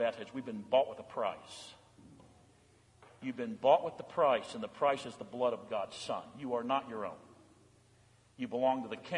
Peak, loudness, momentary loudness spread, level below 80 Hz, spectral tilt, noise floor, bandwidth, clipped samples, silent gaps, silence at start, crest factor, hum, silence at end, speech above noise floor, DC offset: -14 dBFS; -35 LUFS; 14 LU; -78 dBFS; -5 dB/octave; -65 dBFS; 11 kHz; under 0.1%; none; 0 s; 22 dB; none; 0 s; 31 dB; under 0.1%